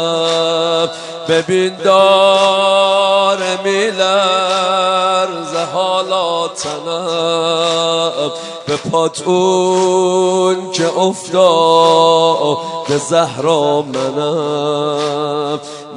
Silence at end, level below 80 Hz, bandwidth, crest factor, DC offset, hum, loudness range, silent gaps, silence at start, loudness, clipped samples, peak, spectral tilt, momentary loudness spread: 0 s; -64 dBFS; 11 kHz; 14 dB; under 0.1%; none; 4 LU; none; 0 s; -13 LUFS; under 0.1%; 0 dBFS; -4 dB/octave; 9 LU